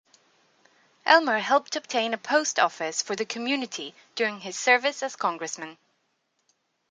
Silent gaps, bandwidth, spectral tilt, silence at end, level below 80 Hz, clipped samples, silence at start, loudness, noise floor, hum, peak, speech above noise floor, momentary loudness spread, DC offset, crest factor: none; 10 kHz; -1.5 dB/octave; 1.15 s; -84 dBFS; under 0.1%; 1.05 s; -25 LUFS; -74 dBFS; none; -2 dBFS; 48 dB; 14 LU; under 0.1%; 24 dB